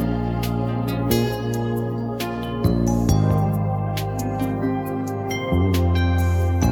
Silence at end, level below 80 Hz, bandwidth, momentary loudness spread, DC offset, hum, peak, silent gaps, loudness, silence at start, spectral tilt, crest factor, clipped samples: 0 s; -32 dBFS; 19 kHz; 7 LU; under 0.1%; none; -4 dBFS; none; -22 LUFS; 0 s; -7 dB/octave; 16 dB; under 0.1%